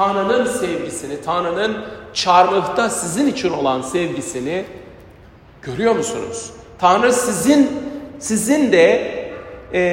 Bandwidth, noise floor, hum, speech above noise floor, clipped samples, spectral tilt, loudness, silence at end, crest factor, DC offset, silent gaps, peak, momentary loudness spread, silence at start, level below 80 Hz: 16.5 kHz; -44 dBFS; none; 27 dB; under 0.1%; -4 dB/octave; -18 LUFS; 0 s; 18 dB; under 0.1%; none; 0 dBFS; 15 LU; 0 s; -50 dBFS